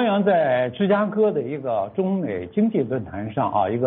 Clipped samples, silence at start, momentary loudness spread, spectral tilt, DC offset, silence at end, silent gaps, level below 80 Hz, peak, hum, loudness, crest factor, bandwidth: under 0.1%; 0 s; 7 LU; -6 dB/octave; under 0.1%; 0 s; none; -58 dBFS; -8 dBFS; none; -22 LUFS; 14 dB; 4.1 kHz